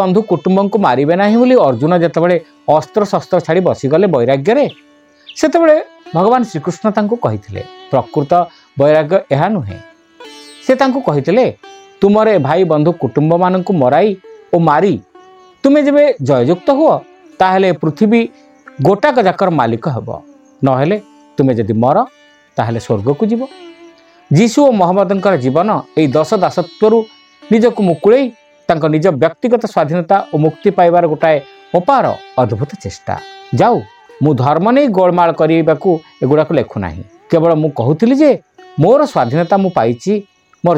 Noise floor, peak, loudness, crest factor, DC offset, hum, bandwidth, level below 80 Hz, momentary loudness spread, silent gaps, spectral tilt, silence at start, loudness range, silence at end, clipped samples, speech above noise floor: -42 dBFS; 0 dBFS; -13 LUFS; 12 dB; under 0.1%; none; 10 kHz; -52 dBFS; 10 LU; none; -7.5 dB/octave; 0 s; 3 LU; 0 s; under 0.1%; 30 dB